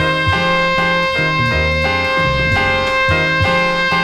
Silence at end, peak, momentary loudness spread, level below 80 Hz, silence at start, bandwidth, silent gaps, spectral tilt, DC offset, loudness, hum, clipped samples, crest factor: 0 s; -2 dBFS; 1 LU; -30 dBFS; 0 s; 15 kHz; none; -5 dB/octave; under 0.1%; -14 LUFS; none; under 0.1%; 12 dB